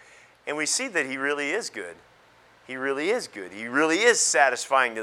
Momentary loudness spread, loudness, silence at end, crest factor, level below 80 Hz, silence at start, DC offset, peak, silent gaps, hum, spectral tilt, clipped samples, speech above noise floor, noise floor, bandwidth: 17 LU; -24 LUFS; 0 s; 22 dB; -76 dBFS; 0.45 s; under 0.1%; -4 dBFS; none; none; -1 dB/octave; under 0.1%; 31 dB; -56 dBFS; 15.5 kHz